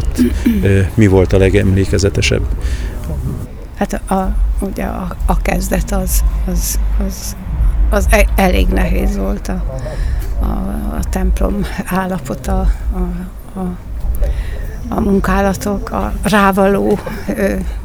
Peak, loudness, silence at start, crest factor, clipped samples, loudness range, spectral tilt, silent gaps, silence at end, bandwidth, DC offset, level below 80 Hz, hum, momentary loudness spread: 0 dBFS; -16 LUFS; 0 s; 14 dB; under 0.1%; 5 LU; -6 dB/octave; none; 0 s; 17 kHz; under 0.1%; -18 dBFS; none; 11 LU